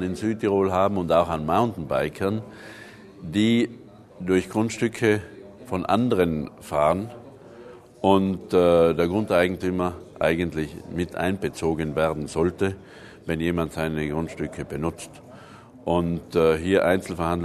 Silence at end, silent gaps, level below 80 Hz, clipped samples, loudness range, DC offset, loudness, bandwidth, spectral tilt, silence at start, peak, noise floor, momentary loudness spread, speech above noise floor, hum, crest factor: 0 s; none; -48 dBFS; under 0.1%; 5 LU; under 0.1%; -24 LUFS; 13.5 kHz; -6.5 dB/octave; 0 s; -4 dBFS; -46 dBFS; 15 LU; 23 dB; none; 20 dB